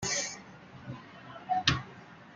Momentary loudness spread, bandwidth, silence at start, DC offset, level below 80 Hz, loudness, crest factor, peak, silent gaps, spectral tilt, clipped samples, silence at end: 21 LU; 10.5 kHz; 0 s; under 0.1%; -56 dBFS; -31 LUFS; 30 dB; -6 dBFS; none; -2.5 dB/octave; under 0.1%; 0 s